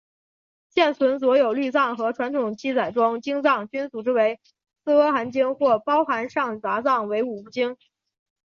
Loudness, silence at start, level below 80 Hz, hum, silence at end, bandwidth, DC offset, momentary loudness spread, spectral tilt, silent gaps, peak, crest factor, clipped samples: -22 LUFS; 0.75 s; -70 dBFS; none; 0.7 s; 7 kHz; under 0.1%; 8 LU; -5.5 dB/octave; none; -6 dBFS; 16 dB; under 0.1%